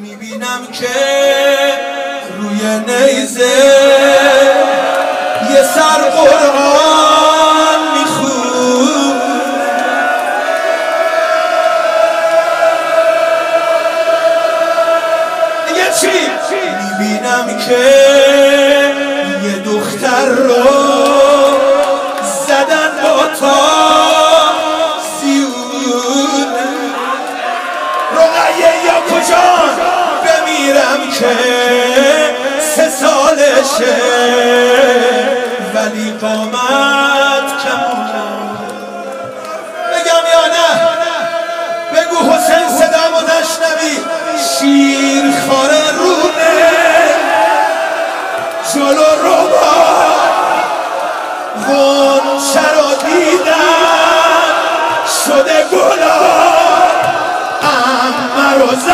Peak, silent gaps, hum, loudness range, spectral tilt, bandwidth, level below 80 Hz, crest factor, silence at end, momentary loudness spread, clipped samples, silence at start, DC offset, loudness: 0 dBFS; none; none; 4 LU; -2 dB/octave; 16.5 kHz; -54 dBFS; 10 dB; 0 s; 9 LU; 0.3%; 0 s; under 0.1%; -10 LUFS